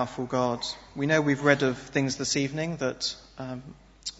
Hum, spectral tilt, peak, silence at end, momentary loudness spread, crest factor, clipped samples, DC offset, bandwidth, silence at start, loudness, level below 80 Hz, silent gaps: none; -4.5 dB/octave; -6 dBFS; 0.1 s; 15 LU; 22 dB; under 0.1%; under 0.1%; 8 kHz; 0 s; -27 LUFS; -58 dBFS; none